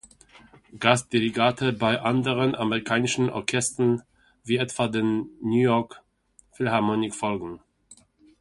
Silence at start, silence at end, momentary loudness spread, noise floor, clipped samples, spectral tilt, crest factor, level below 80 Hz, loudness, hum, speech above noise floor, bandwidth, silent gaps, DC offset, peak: 0.75 s; 0.45 s; 8 LU; -61 dBFS; under 0.1%; -5 dB/octave; 24 dB; -60 dBFS; -24 LUFS; none; 37 dB; 11.5 kHz; none; under 0.1%; 0 dBFS